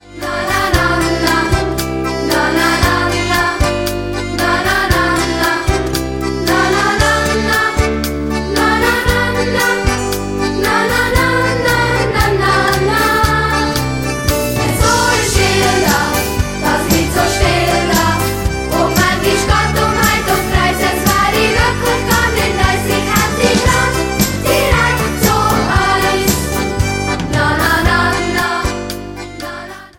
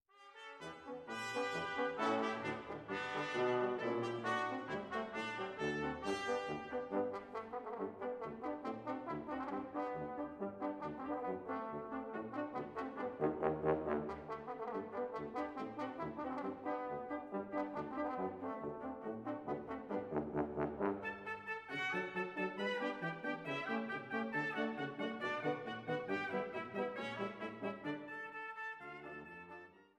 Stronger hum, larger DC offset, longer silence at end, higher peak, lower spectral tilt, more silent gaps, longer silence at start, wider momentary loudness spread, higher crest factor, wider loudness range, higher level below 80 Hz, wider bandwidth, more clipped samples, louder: neither; neither; about the same, 0.1 s vs 0.15 s; first, 0 dBFS vs -18 dBFS; second, -4 dB/octave vs -6 dB/octave; neither; about the same, 0.05 s vs 0.15 s; about the same, 6 LU vs 8 LU; second, 14 dB vs 22 dB; about the same, 2 LU vs 4 LU; first, -24 dBFS vs -70 dBFS; first, 17 kHz vs 12 kHz; neither; first, -13 LUFS vs -42 LUFS